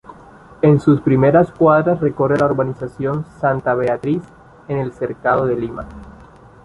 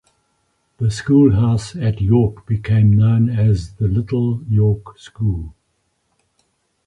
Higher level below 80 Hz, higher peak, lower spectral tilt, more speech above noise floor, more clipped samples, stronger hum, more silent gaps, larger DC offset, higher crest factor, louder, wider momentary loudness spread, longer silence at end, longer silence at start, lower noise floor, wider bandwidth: second, -46 dBFS vs -36 dBFS; about the same, -2 dBFS vs -2 dBFS; about the same, -9.5 dB/octave vs -8.5 dB/octave; second, 26 dB vs 52 dB; neither; neither; neither; neither; about the same, 16 dB vs 16 dB; about the same, -17 LUFS vs -17 LUFS; about the same, 11 LU vs 10 LU; second, 0.4 s vs 1.35 s; second, 0.1 s vs 0.8 s; second, -43 dBFS vs -67 dBFS; about the same, 10.5 kHz vs 10 kHz